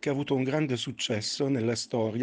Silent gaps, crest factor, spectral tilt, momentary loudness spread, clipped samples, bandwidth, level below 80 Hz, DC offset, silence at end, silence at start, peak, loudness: none; 14 dB; -5 dB/octave; 3 LU; under 0.1%; 10 kHz; -68 dBFS; under 0.1%; 0 s; 0.05 s; -14 dBFS; -29 LUFS